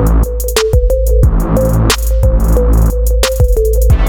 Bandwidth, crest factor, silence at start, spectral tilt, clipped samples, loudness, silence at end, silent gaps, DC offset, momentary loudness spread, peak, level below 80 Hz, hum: 19.5 kHz; 10 dB; 0 s; -5.5 dB/octave; under 0.1%; -12 LUFS; 0 s; none; under 0.1%; 2 LU; 0 dBFS; -10 dBFS; none